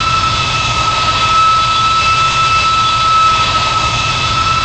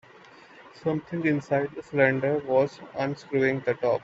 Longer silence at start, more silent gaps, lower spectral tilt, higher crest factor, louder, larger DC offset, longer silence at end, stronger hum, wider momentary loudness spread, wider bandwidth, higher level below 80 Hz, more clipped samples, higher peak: second, 0 s vs 0.6 s; neither; second, -2.5 dB/octave vs -7.5 dB/octave; second, 8 dB vs 22 dB; first, -10 LUFS vs -26 LUFS; first, 0.4% vs under 0.1%; about the same, 0 s vs 0.05 s; neither; second, 3 LU vs 8 LU; first, 9.2 kHz vs 7.8 kHz; first, -30 dBFS vs -66 dBFS; neither; about the same, -4 dBFS vs -6 dBFS